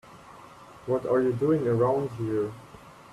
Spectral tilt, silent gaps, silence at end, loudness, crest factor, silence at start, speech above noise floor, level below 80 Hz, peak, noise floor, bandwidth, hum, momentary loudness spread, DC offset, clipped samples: -8.5 dB/octave; none; 0 s; -26 LUFS; 16 dB; 0.05 s; 23 dB; -62 dBFS; -12 dBFS; -49 dBFS; 13 kHz; none; 21 LU; under 0.1%; under 0.1%